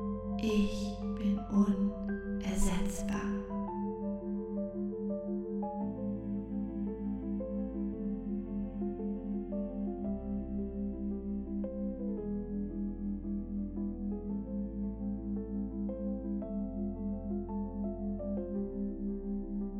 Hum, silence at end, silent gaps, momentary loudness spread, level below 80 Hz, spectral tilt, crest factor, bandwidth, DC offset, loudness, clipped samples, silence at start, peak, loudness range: none; 0 s; none; 5 LU; -46 dBFS; -7 dB/octave; 18 dB; 13 kHz; under 0.1%; -37 LUFS; under 0.1%; 0 s; -16 dBFS; 4 LU